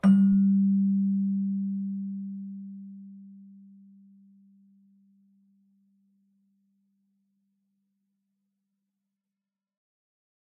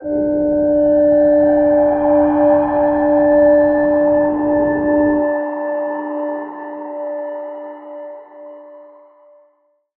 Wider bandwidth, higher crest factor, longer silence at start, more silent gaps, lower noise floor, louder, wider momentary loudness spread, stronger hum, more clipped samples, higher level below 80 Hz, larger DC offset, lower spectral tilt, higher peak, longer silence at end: about the same, 3 kHz vs 2.9 kHz; first, 18 dB vs 12 dB; about the same, 0.05 s vs 0 s; neither; first, -89 dBFS vs -60 dBFS; second, -26 LUFS vs -15 LUFS; first, 25 LU vs 17 LU; neither; neither; second, -68 dBFS vs -44 dBFS; neither; second, -10.5 dB/octave vs -12 dB/octave; second, -12 dBFS vs -2 dBFS; first, 7.1 s vs 1.15 s